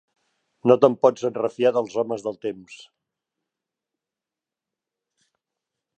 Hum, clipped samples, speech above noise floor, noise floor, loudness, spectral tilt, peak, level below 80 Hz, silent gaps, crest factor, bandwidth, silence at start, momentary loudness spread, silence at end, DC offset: none; under 0.1%; 67 dB; -89 dBFS; -22 LUFS; -6.5 dB/octave; -2 dBFS; -76 dBFS; none; 22 dB; 8.6 kHz; 0.65 s; 15 LU; 3.2 s; under 0.1%